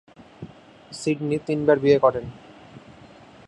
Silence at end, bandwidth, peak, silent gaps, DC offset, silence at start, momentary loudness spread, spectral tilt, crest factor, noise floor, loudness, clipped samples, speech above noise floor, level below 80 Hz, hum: 0.7 s; 11.5 kHz; -4 dBFS; none; under 0.1%; 0.2 s; 25 LU; -6.5 dB/octave; 20 dB; -47 dBFS; -22 LUFS; under 0.1%; 27 dB; -58 dBFS; none